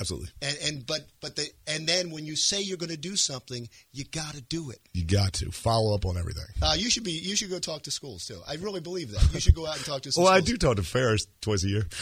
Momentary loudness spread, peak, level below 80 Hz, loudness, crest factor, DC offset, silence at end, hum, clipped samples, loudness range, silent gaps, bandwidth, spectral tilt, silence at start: 12 LU; -4 dBFS; -36 dBFS; -27 LUFS; 24 dB; under 0.1%; 0 s; none; under 0.1%; 4 LU; none; 15 kHz; -4 dB/octave; 0 s